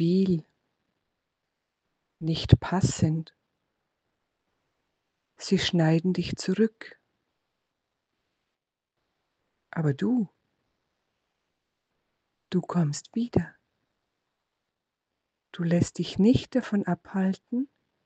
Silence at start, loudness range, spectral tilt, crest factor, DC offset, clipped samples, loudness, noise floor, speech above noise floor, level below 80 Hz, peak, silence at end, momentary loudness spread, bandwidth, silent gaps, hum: 0 s; 6 LU; -6.5 dB/octave; 28 dB; under 0.1%; under 0.1%; -27 LUFS; -85 dBFS; 60 dB; -50 dBFS; -2 dBFS; 0.4 s; 13 LU; 9 kHz; none; none